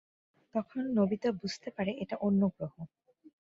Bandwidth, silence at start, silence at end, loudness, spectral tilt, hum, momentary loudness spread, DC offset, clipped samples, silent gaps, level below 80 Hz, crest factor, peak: 7.6 kHz; 0.55 s; 0.55 s; -33 LUFS; -7 dB/octave; none; 13 LU; under 0.1%; under 0.1%; none; -68 dBFS; 16 dB; -18 dBFS